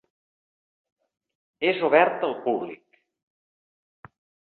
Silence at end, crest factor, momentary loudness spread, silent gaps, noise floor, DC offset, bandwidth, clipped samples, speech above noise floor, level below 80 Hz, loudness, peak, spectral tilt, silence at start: 1.85 s; 24 dB; 10 LU; none; under -90 dBFS; under 0.1%; 4.5 kHz; under 0.1%; over 67 dB; -74 dBFS; -23 LUFS; -4 dBFS; -8.5 dB/octave; 1.6 s